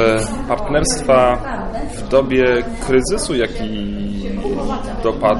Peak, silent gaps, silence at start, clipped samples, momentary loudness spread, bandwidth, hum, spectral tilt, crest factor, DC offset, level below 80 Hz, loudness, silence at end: -2 dBFS; none; 0 s; under 0.1%; 10 LU; 11.5 kHz; none; -4.5 dB/octave; 16 dB; under 0.1%; -28 dBFS; -18 LUFS; 0 s